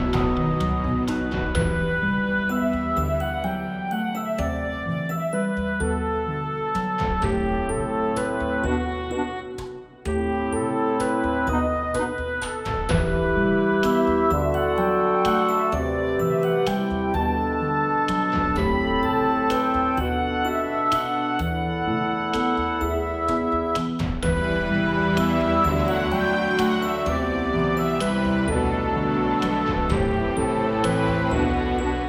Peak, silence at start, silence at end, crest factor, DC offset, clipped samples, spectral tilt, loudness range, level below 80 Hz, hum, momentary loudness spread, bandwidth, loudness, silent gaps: -8 dBFS; 0 s; 0 s; 16 dB; under 0.1%; under 0.1%; -6.5 dB/octave; 4 LU; -34 dBFS; none; 6 LU; 16.5 kHz; -23 LUFS; none